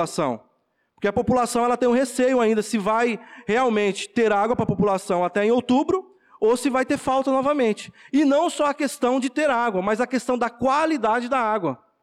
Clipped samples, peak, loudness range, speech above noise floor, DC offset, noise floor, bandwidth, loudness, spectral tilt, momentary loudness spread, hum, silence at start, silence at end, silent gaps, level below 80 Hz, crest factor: under 0.1%; -12 dBFS; 1 LU; 47 dB; under 0.1%; -69 dBFS; 14 kHz; -22 LUFS; -5 dB/octave; 5 LU; none; 0 s; 0.3 s; none; -56 dBFS; 10 dB